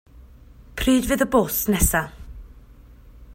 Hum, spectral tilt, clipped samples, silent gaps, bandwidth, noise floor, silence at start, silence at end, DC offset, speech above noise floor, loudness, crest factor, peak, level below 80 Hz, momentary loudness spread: none; -4 dB/octave; under 0.1%; none; 16.5 kHz; -46 dBFS; 0.15 s; 0 s; under 0.1%; 26 dB; -20 LUFS; 20 dB; -4 dBFS; -34 dBFS; 17 LU